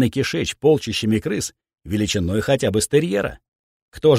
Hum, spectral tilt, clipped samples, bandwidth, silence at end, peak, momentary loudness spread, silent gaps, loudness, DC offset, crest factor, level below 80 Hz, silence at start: none; -5 dB/octave; under 0.1%; 16 kHz; 0 s; -4 dBFS; 8 LU; 3.48-3.92 s; -21 LUFS; under 0.1%; 16 dB; -44 dBFS; 0 s